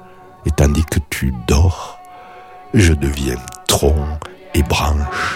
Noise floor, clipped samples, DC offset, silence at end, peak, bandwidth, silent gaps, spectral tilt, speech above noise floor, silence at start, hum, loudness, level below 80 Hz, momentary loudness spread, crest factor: -37 dBFS; under 0.1%; under 0.1%; 0 s; -2 dBFS; 16.5 kHz; none; -5 dB/octave; 22 dB; 0 s; none; -17 LUFS; -22 dBFS; 16 LU; 16 dB